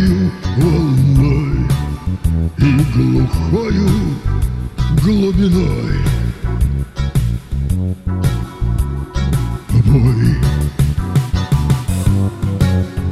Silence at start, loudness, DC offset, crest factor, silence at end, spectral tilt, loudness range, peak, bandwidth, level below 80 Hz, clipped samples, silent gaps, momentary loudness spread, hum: 0 s; -16 LUFS; under 0.1%; 14 dB; 0 s; -7.5 dB/octave; 4 LU; -2 dBFS; 14.5 kHz; -22 dBFS; under 0.1%; none; 7 LU; none